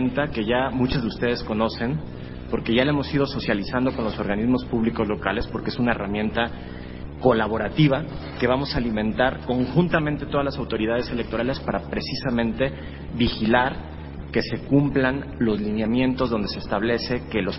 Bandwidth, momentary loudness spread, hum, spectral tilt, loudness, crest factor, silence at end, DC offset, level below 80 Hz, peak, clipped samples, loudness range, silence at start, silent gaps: 5.8 kHz; 7 LU; none; -10 dB/octave; -24 LUFS; 20 dB; 0 s; under 0.1%; -38 dBFS; -2 dBFS; under 0.1%; 2 LU; 0 s; none